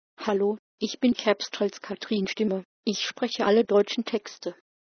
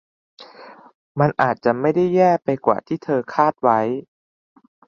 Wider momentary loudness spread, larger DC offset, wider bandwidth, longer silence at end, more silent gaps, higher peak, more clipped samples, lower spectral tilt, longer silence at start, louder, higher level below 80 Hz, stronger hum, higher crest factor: first, 10 LU vs 7 LU; neither; about the same, 6.6 kHz vs 7 kHz; second, 0.35 s vs 0.85 s; first, 0.59-0.78 s, 2.65-2.83 s vs 0.95-1.15 s; second, -8 dBFS vs -2 dBFS; neither; second, -4.5 dB/octave vs -8.5 dB/octave; second, 0.2 s vs 0.4 s; second, -26 LUFS vs -19 LUFS; second, -68 dBFS vs -62 dBFS; neither; about the same, 20 dB vs 18 dB